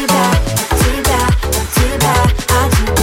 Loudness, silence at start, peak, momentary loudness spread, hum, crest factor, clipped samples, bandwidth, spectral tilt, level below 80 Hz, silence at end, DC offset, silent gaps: -13 LUFS; 0 s; 0 dBFS; 3 LU; none; 12 dB; under 0.1%; 16.5 kHz; -4 dB/octave; -18 dBFS; 0 s; under 0.1%; none